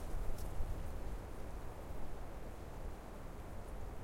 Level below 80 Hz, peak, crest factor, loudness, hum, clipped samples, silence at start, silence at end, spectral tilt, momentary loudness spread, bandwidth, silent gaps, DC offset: -46 dBFS; -26 dBFS; 16 dB; -49 LUFS; none; under 0.1%; 0 s; 0 s; -6 dB/octave; 5 LU; 16.5 kHz; none; under 0.1%